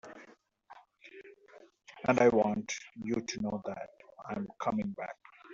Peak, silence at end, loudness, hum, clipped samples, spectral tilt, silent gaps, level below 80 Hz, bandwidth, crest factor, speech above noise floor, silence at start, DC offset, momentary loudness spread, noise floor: -12 dBFS; 0 s; -33 LUFS; none; under 0.1%; -5 dB/octave; none; -68 dBFS; 7.6 kHz; 24 dB; 28 dB; 0.05 s; under 0.1%; 26 LU; -60 dBFS